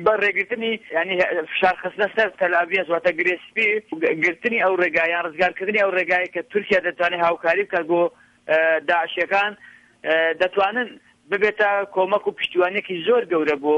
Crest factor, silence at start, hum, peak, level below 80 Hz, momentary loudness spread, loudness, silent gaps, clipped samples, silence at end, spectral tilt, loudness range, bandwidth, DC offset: 16 dB; 0 s; none; -6 dBFS; -64 dBFS; 5 LU; -20 LUFS; none; under 0.1%; 0 s; -5 dB/octave; 1 LU; 8.8 kHz; under 0.1%